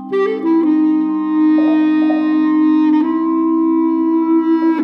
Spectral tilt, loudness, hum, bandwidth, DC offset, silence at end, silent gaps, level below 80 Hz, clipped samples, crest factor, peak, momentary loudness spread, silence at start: -8 dB/octave; -14 LUFS; none; 4.5 kHz; under 0.1%; 0 s; none; -64 dBFS; under 0.1%; 8 dB; -6 dBFS; 3 LU; 0 s